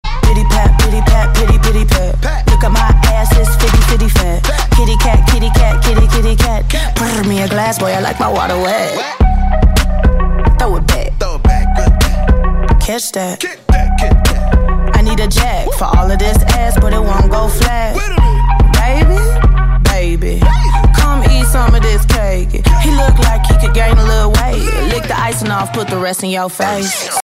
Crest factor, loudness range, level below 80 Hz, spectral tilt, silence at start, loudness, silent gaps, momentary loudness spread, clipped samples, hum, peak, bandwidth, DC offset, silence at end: 10 dB; 2 LU; -10 dBFS; -5 dB/octave; 0.05 s; -12 LUFS; none; 5 LU; under 0.1%; none; 0 dBFS; 16 kHz; under 0.1%; 0 s